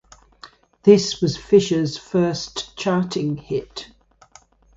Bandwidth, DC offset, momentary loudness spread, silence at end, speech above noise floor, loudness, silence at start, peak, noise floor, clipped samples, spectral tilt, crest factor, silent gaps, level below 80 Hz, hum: 7.8 kHz; under 0.1%; 12 LU; 0.9 s; 33 dB; -20 LUFS; 0.45 s; 0 dBFS; -52 dBFS; under 0.1%; -5.5 dB/octave; 20 dB; none; -52 dBFS; none